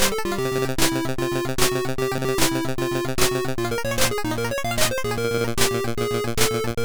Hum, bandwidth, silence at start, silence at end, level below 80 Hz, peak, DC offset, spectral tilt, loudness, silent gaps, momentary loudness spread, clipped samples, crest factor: none; over 20 kHz; 0 s; 0 s; -38 dBFS; -6 dBFS; under 0.1%; -3.5 dB/octave; -23 LUFS; none; 4 LU; under 0.1%; 16 dB